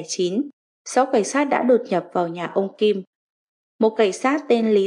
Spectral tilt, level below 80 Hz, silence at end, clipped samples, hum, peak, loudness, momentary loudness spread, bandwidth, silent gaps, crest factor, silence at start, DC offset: -4.5 dB/octave; -80 dBFS; 0 s; under 0.1%; none; -6 dBFS; -21 LUFS; 7 LU; 11.5 kHz; 0.53-0.85 s, 3.07-3.79 s; 16 dB; 0 s; under 0.1%